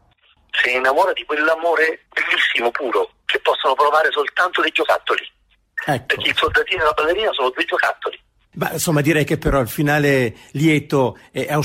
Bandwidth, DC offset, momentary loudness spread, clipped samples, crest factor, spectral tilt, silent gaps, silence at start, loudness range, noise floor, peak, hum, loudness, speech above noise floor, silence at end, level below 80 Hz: 16 kHz; under 0.1%; 7 LU; under 0.1%; 14 dB; -4.5 dB/octave; none; 0.55 s; 2 LU; -57 dBFS; -4 dBFS; none; -18 LUFS; 39 dB; 0 s; -42 dBFS